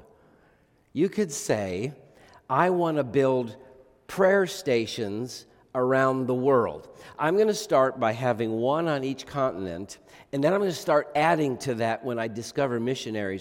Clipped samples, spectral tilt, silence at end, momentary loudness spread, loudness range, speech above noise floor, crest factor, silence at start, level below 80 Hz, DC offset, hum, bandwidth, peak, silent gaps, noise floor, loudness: under 0.1%; -5.5 dB/octave; 0 s; 12 LU; 2 LU; 37 dB; 20 dB; 0.95 s; -66 dBFS; under 0.1%; none; 17 kHz; -6 dBFS; none; -62 dBFS; -26 LUFS